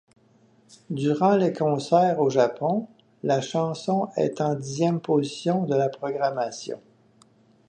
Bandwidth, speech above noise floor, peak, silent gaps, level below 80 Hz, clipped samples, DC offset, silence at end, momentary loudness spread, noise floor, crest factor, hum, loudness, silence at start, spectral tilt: 9.6 kHz; 36 dB; -6 dBFS; none; -72 dBFS; under 0.1%; under 0.1%; 0.9 s; 10 LU; -59 dBFS; 18 dB; none; -24 LUFS; 0.9 s; -6.5 dB/octave